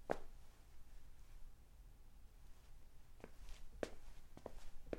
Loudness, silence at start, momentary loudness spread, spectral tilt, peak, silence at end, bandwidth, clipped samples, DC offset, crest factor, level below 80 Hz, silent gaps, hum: -58 LUFS; 0 s; 16 LU; -5.5 dB/octave; -22 dBFS; 0 s; 16 kHz; under 0.1%; under 0.1%; 30 dB; -56 dBFS; none; none